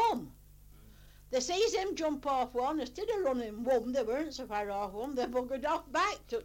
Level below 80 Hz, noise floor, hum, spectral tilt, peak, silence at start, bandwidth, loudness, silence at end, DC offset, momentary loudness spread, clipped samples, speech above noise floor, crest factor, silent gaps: -58 dBFS; -56 dBFS; 50 Hz at -60 dBFS; -3.5 dB/octave; -18 dBFS; 0 s; 17 kHz; -33 LUFS; 0 s; under 0.1%; 6 LU; under 0.1%; 23 dB; 16 dB; none